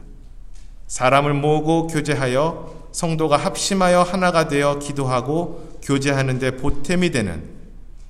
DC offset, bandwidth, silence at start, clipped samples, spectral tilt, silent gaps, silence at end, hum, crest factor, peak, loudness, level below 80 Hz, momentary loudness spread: under 0.1%; 14.5 kHz; 0.05 s; under 0.1%; -5 dB/octave; none; 0 s; none; 18 dB; -2 dBFS; -19 LUFS; -38 dBFS; 11 LU